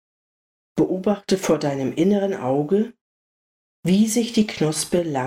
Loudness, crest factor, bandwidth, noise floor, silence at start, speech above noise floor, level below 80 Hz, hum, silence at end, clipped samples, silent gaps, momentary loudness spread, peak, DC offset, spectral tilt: -21 LUFS; 16 dB; 16 kHz; under -90 dBFS; 0.75 s; over 70 dB; -58 dBFS; none; 0 s; under 0.1%; 3.01-3.83 s; 5 LU; -6 dBFS; under 0.1%; -5.5 dB/octave